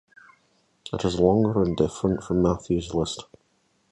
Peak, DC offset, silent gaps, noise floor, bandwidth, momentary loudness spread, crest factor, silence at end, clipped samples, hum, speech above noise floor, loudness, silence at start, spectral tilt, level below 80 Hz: -6 dBFS; under 0.1%; none; -68 dBFS; 11 kHz; 12 LU; 20 dB; 0.7 s; under 0.1%; none; 44 dB; -24 LUFS; 0.85 s; -7 dB/octave; -44 dBFS